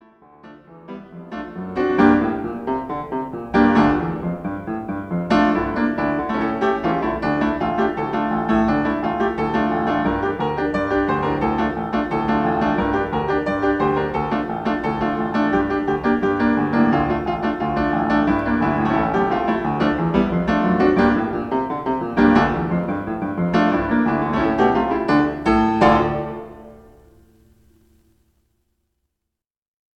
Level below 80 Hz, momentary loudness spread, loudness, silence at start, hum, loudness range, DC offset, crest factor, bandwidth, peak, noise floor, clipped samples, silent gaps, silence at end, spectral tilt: -40 dBFS; 10 LU; -20 LUFS; 0.45 s; none; 3 LU; under 0.1%; 18 dB; 7.6 kHz; -2 dBFS; -83 dBFS; under 0.1%; none; 3.2 s; -8 dB/octave